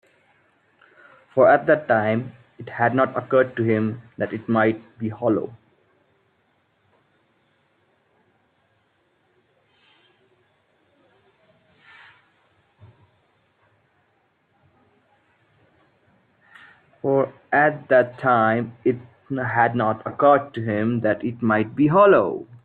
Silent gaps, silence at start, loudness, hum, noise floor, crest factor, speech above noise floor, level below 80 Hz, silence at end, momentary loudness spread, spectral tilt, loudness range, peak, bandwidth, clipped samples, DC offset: none; 1.35 s; -20 LUFS; none; -66 dBFS; 20 dB; 46 dB; -66 dBFS; 0.1 s; 13 LU; -10 dB/octave; 11 LU; -4 dBFS; 4.4 kHz; under 0.1%; under 0.1%